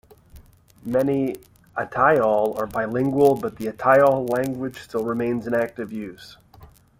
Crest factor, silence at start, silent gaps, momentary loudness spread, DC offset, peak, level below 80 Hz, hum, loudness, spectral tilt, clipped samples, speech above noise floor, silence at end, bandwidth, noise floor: 20 dB; 0.35 s; none; 15 LU; under 0.1%; -4 dBFS; -54 dBFS; none; -22 LUFS; -7 dB/octave; under 0.1%; 28 dB; 0.35 s; 16.5 kHz; -49 dBFS